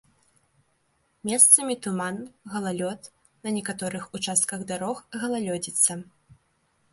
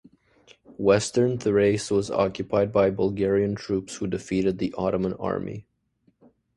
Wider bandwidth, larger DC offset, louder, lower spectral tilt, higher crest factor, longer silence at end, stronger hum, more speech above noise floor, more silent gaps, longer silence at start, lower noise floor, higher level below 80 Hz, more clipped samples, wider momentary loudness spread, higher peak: about the same, 12 kHz vs 11.5 kHz; neither; about the same, -23 LUFS vs -24 LUFS; second, -2.5 dB/octave vs -6 dB/octave; first, 26 dB vs 20 dB; about the same, 0.9 s vs 0.95 s; neither; about the same, 44 dB vs 43 dB; neither; first, 1.25 s vs 0.7 s; about the same, -70 dBFS vs -67 dBFS; second, -70 dBFS vs -52 dBFS; neither; first, 19 LU vs 8 LU; first, -2 dBFS vs -6 dBFS